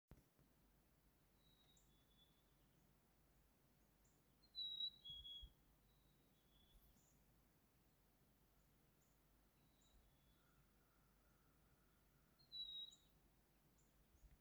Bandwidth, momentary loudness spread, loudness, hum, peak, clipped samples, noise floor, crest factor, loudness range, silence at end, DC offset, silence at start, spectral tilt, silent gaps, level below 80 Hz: over 20 kHz; 12 LU; -52 LUFS; none; -40 dBFS; under 0.1%; -78 dBFS; 22 dB; 8 LU; 0 s; under 0.1%; 0.1 s; -2.5 dB/octave; none; -78 dBFS